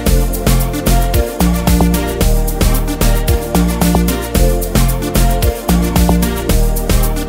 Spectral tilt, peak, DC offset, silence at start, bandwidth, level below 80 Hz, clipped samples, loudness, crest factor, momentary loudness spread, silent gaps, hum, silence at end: -5.5 dB/octave; 0 dBFS; under 0.1%; 0 s; 16.5 kHz; -14 dBFS; under 0.1%; -14 LUFS; 12 dB; 3 LU; none; none; 0 s